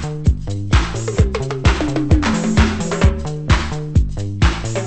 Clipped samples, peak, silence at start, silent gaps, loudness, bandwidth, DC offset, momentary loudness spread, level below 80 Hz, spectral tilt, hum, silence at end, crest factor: under 0.1%; -2 dBFS; 0 s; none; -18 LUFS; 8.8 kHz; under 0.1%; 4 LU; -20 dBFS; -6 dB/octave; none; 0 s; 14 dB